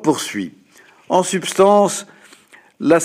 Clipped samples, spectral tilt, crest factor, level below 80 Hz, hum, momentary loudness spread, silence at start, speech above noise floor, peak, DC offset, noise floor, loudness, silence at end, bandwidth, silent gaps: under 0.1%; -4 dB/octave; 16 dB; -64 dBFS; none; 15 LU; 0 s; 31 dB; -2 dBFS; under 0.1%; -48 dBFS; -17 LUFS; 0 s; 15.5 kHz; none